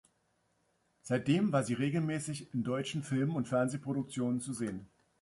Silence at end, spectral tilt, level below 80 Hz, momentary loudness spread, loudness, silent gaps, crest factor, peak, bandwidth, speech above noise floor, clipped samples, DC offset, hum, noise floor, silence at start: 0.35 s; -6 dB/octave; -70 dBFS; 8 LU; -34 LUFS; none; 18 dB; -16 dBFS; 11.5 kHz; 43 dB; under 0.1%; under 0.1%; none; -76 dBFS; 1.05 s